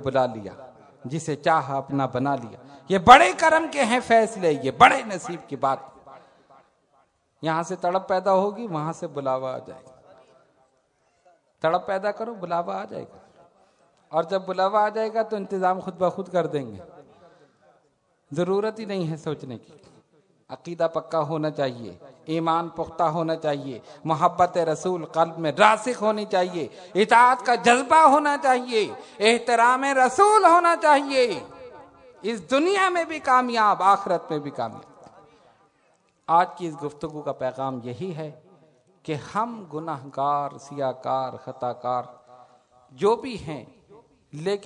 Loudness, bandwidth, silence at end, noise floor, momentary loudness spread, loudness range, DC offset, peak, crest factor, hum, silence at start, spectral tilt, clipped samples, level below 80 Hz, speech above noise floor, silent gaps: -22 LUFS; 11 kHz; 0 s; -67 dBFS; 17 LU; 11 LU; under 0.1%; 0 dBFS; 24 dB; none; 0 s; -4.5 dB/octave; under 0.1%; -62 dBFS; 44 dB; none